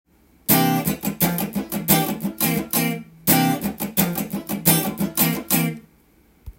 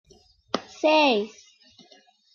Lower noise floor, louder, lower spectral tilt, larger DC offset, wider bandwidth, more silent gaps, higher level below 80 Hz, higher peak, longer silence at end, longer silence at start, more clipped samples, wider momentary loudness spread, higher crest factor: about the same, -56 dBFS vs -57 dBFS; first, -20 LUFS vs -23 LUFS; about the same, -4 dB/octave vs -3.5 dB/octave; neither; first, 17 kHz vs 7.2 kHz; neither; first, -50 dBFS vs -70 dBFS; first, -2 dBFS vs -8 dBFS; second, 0.05 s vs 1.05 s; about the same, 0.5 s vs 0.55 s; neither; second, 8 LU vs 14 LU; about the same, 22 dB vs 18 dB